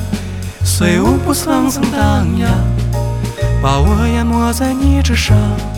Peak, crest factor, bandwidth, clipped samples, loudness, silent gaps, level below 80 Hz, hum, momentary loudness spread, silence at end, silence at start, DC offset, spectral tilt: 0 dBFS; 12 dB; 18 kHz; under 0.1%; -14 LUFS; none; -22 dBFS; none; 6 LU; 0 s; 0 s; under 0.1%; -5.5 dB/octave